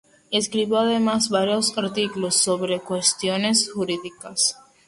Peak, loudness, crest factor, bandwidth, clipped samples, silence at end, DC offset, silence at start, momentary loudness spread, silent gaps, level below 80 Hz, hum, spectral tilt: -6 dBFS; -21 LUFS; 18 dB; 12 kHz; under 0.1%; 0.35 s; under 0.1%; 0.3 s; 6 LU; none; -64 dBFS; none; -2.5 dB/octave